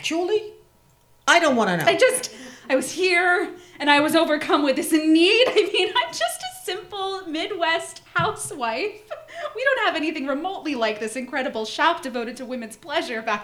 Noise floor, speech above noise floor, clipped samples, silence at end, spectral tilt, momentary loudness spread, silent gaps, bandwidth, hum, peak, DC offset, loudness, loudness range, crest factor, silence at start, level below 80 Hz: -57 dBFS; 35 dB; under 0.1%; 0 s; -3 dB/octave; 14 LU; none; 15.5 kHz; none; 0 dBFS; under 0.1%; -21 LUFS; 7 LU; 22 dB; 0 s; -64 dBFS